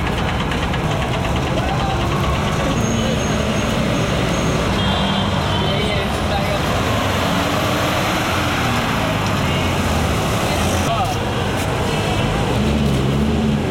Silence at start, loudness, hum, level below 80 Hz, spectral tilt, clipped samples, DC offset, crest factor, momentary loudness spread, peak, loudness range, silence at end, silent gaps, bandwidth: 0 s; -18 LUFS; none; -30 dBFS; -5 dB/octave; under 0.1%; under 0.1%; 12 dB; 2 LU; -6 dBFS; 1 LU; 0 s; none; 16.5 kHz